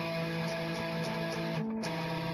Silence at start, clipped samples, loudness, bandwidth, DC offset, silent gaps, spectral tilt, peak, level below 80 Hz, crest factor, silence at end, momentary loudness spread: 0 s; under 0.1%; -35 LUFS; 14.5 kHz; under 0.1%; none; -6 dB/octave; -22 dBFS; -62 dBFS; 12 dB; 0 s; 1 LU